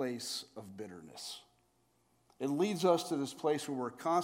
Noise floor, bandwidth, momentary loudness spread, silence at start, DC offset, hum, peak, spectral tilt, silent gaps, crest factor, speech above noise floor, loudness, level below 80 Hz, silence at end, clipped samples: -74 dBFS; 16.5 kHz; 17 LU; 0 s; under 0.1%; none; -16 dBFS; -4.5 dB/octave; none; 20 dB; 40 dB; -35 LUFS; -86 dBFS; 0 s; under 0.1%